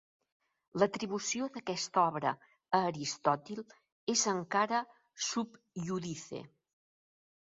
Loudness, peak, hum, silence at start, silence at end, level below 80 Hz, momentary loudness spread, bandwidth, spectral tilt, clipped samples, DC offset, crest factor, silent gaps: -34 LUFS; -12 dBFS; none; 0.75 s; 0.95 s; -76 dBFS; 15 LU; 7.6 kHz; -3.5 dB/octave; under 0.1%; under 0.1%; 22 dB; 3.92-4.07 s